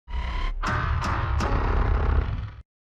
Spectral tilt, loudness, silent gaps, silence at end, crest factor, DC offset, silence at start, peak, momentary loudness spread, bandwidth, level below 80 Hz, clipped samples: -6.5 dB/octave; -27 LUFS; none; 0.25 s; 14 dB; under 0.1%; 0.1 s; -10 dBFS; 7 LU; 8.4 kHz; -26 dBFS; under 0.1%